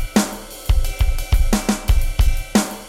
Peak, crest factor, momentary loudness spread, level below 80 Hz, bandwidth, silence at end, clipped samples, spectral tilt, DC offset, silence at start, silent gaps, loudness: -4 dBFS; 12 dB; 4 LU; -18 dBFS; 16.5 kHz; 0 s; under 0.1%; -5 dB/octave; under 0.1%; 0 s; none; -21 LUFS